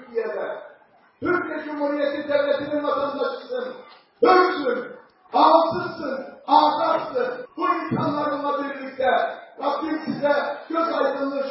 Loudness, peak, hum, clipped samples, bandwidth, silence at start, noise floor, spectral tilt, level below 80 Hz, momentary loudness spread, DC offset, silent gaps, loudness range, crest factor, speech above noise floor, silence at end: -23 LUFS; -4 dBFS; none; under 0.1%; 5.8 kHz; 0 s; -54 dBFS; -9.5 dB/octave; -66 dBFS; 13 LU; under 0.1%; none; 5 LU; 20 dB; 33 dB; 0 s